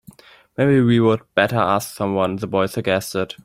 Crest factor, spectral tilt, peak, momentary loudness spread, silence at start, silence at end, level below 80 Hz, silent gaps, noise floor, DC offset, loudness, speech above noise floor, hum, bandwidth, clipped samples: 18 dB; -6 dB/octave; -2 dBFS; 7 LU; 0.6 s; 0.1 s; -56 dBFS; none; -46 dBFS; under 0.1%; -19 LUFS; 28 dB; none; 16 kHz; under 0.1%